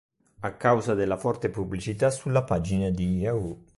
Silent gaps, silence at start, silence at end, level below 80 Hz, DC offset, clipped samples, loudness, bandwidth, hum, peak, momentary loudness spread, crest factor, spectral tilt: none; 0.4 s; 0.2 s; -46 dBFS; under 0.1%; under 0.1%; -27 LUFS; 11.5 kHz; none; -8 dBFS; 8 LU; 18 dB; -7 dB/octave